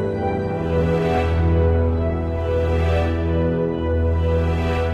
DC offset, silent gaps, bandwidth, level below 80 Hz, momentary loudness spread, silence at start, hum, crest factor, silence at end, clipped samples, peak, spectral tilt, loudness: under 0.1%; none; 7 kHz; -26 dBFS; 4 LU; 0 s; none; 12 dB; 0 s; under 0.1%; -8 dBFS; -8.5 dB/octave; -20 LUFS